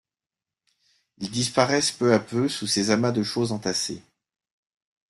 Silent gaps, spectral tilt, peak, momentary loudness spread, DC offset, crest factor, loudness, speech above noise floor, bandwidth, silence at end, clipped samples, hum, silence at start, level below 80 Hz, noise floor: none; -4 dB/octave; -4 dBFS; 10 LU; under 0.1%; 22 dB; -24 LUFS; over 66 dB; 12.5 kHz; 1.1 s; under 0.1%; none; 1.2 s; -64 dBFS; under -90 dBFS